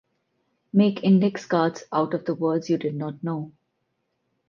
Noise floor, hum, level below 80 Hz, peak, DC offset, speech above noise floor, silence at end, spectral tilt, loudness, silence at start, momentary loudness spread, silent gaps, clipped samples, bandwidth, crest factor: -75 dBFS; none; -72 dBFS; -6 dBFS; under 0.1%; 52 dB; 1 s; -7.5 dB/octave; -24 LUFS; 0.75 s; 11 LU; none; under 0.1%; 7.2 kHz; 18 dB